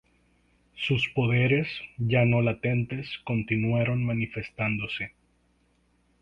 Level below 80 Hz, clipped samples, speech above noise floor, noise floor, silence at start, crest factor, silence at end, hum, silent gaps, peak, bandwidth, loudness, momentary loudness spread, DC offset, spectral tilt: -54 dBFS; under 0.1%; 41 dB; -67 dBFS; 0.75 s; 16 dB; 1.15 s; 60 Hz at -40 dBFS; none; -10 dBFS; 6.6 kHz; -27 LUFS; 10 LU; under 0.1%; -8 dB/octave